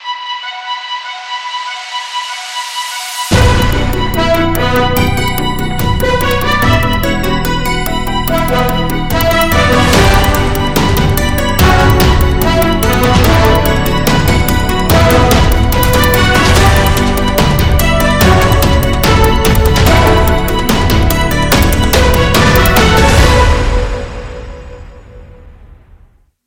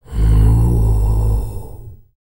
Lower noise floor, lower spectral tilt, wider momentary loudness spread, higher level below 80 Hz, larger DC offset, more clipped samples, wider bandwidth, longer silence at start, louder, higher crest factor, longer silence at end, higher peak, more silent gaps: first, -45 dBFS vs -34 dBFS; second, -5 dB/octave vs -8.5 dB/octave; second, 11 LU vs 17 LU; about the same, -16 dBFS vs -16 dBFS; second, under 0.1% vs 2%; neither; about the same, 17.5 kHz vs 16.5 kHz; about the same, 0 s vs 0 s; first, -11 LUFS vs -16 LUFS; about the same, 10 dB vs 12 dB; first, 0.8 s vs 0.1 s; about the same, 0 dBFS vs -2 dBFS; neither